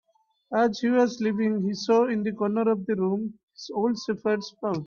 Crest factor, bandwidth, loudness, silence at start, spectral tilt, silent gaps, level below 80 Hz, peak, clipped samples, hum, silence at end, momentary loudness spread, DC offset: 16 dB; 7.2 kHz; -26 LUFS; 0.5 s; -6.5 dB/octave; 3.43-3.48 s; -70 dBFS; -10 dBFS; under 0.1%; none; 0 s; 8 LU; under 0.1%